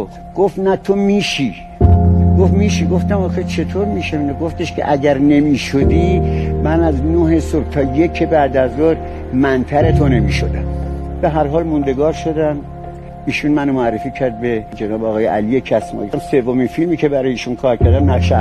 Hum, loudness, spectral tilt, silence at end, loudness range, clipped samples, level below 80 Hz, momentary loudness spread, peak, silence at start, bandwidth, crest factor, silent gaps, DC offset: none; -15 LUFS; -7.5 dB/octave; 0 s; 4 LU; under 0.1%; -26 dBFS; 8 LU; 0 dBFS; 0 s; 9.8 kHz; 14 dB; none; under 0.1%